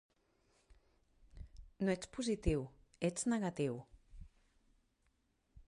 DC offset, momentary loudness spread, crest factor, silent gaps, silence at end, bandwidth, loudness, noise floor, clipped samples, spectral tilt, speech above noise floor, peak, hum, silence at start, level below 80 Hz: under 0.1%; 22 LU; 20 dB; none; 0.1 s; 11.5 kHz; -39 LUFS; -79 dBFS; under 0.1%; -5.5 dB/octave; 41 dB; -22 dBFS; none; 1.35 s; -54 dBFS